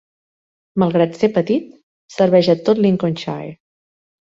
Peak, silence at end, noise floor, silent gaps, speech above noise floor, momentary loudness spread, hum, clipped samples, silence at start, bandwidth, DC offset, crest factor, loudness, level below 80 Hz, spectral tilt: -2 dBFS; 0.75 s; under -90 dBFS; 1.83-2.09 s; over 74 dB; 13 LU; none; under 0.1%; 0.75 s; 7.8 kHz; under 0.1%; 16 dB; -17 LUFS; -58 dBFS; -7.5 dB/octave